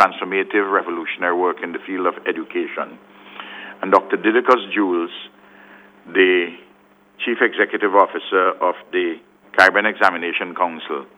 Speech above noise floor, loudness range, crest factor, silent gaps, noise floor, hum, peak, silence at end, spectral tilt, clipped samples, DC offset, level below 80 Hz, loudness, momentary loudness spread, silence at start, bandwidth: 34 dB; 5 LU; 20 dB; none; -52 dBFS; 50 Hz at -55 dBFS; 0 dBFS; 0.15 s; -4.5 dB/octave; under 0.1%; under 0.1%; -70 dBFS; -19 LUFS; 14 LU; 0 s; 11.5 kHz